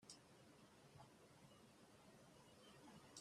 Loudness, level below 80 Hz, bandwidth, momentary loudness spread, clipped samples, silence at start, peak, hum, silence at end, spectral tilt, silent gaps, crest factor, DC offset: -66 LUFS; -88 dBFS; 14 kHz; 4 LU; under 0.1%; 0 s; -42 dBFS; none; 0 s; -3.5 dB/octave; none; 24 dB; under 0.1%